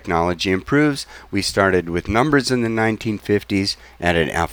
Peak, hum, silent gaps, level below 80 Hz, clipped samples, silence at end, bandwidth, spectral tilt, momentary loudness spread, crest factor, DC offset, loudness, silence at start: -2 dBFS; none; none; -40 dBFS; under 0.1%; 0 s; over 20 kHz; -5 dB/octave; 6 LU; 18 dB; under 0.1%; -19 LUFS; 0.05 s